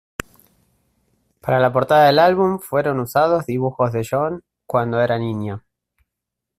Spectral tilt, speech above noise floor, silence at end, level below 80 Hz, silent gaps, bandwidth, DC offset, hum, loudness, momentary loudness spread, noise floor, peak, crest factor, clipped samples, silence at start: -6.5 dB/octave; 65 dB; 1 s; -54 dBFS; none; 16 kHz; under 0.1%; none; -18 LUFS; 17 LU; -82 dBFS; -2 dBFS; 16 dB; under 0.1%; 1.45 s